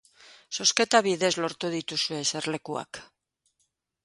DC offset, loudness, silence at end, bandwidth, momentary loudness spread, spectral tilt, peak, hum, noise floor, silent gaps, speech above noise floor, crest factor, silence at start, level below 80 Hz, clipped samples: under 0.1%; -26 LUFS; 1 s; 11.5 kHz; 14 LU; -2 dB/octave; -2 dBFS; none; -76 dBFS; none; 49 dB; 26 dB; 0.3 s; -72 dBFS; under 0.1%